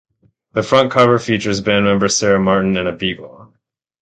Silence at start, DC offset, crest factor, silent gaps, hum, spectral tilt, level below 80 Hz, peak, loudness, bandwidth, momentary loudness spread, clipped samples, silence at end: 0.55 s; under 0.1%; 16 dB; none; none; -4.5 dB/octave; -46 dBFS; 0 dBFS; -15 LUFS; 9.4 kHz; 10 LU; under 0.1%; 0.55 s